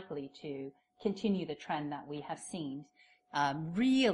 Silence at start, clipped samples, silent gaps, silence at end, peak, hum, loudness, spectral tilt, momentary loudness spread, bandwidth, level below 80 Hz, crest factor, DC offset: 0 s; under 0.1%; none; 0 s; -18 dBFS; none; -37 LUFS; -5.5 dB/octave; 12 LU; 11.5 kHz; -74 dBFS; 18 dB; under 0.1%